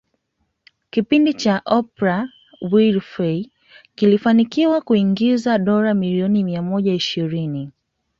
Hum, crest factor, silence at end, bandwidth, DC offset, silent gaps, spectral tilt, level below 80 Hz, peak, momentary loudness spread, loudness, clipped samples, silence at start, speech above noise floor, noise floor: none; 16 dB; 0.5 s; 7.4 kHz; under 0.1%; none; -7 dB/octave; -60 dBFS; -2 dBFS; 9 LU; -18 LUFS; under 0.1%; 0.95 s; 54 dB; -71 dBFS